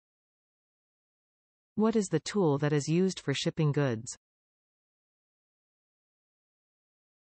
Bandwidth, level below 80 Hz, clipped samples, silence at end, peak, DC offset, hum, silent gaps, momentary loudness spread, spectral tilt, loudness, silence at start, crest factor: 8.8 kHz; -70 dBFS; under 0.1%; 3.2 s; -16 dBFS; under 0.1%; none; none; 11 LU; -6 dB/octave; -29 LUFS; 1.75 s; 18 dB